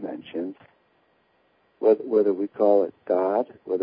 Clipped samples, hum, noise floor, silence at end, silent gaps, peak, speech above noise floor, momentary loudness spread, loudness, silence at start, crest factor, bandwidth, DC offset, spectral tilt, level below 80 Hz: under 0.1%; none; -65 dBFS; 0 s; none; -6 dBFS; 43 dB; 13 LU; -24 LUFS; 0 s; 18 dB; 5 kHz; under 0.1%; -11 dB/octave; -78 dBFS